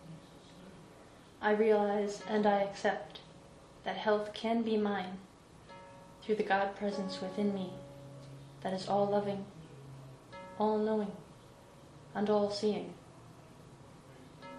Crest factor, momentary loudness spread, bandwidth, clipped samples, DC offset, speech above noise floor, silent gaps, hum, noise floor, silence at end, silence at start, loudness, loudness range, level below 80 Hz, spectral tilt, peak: 20 dB; 24 LU; 11.5 kHz; under 0.1%; under 0.1%; 24 dB; none; none; -56 dBFS; 0 s; 0 s; -34 LUFS; 4 LU; -68 dBFS; -6 dB/octave; -16 dBFS